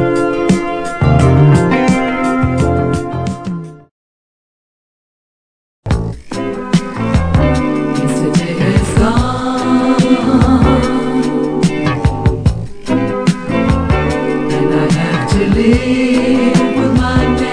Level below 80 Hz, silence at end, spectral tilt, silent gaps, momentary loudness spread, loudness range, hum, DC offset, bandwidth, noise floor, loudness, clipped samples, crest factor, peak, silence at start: -24 dBFS; 0 s; -7 dB/octave; 3.91-5.83 s; 8 LU; 9 LU; none; under 0.1%; 10.5 kHz; under -90 dBFS; -13 LUFS; under 0.1%; 12 dB; 0 dBFS; 0 s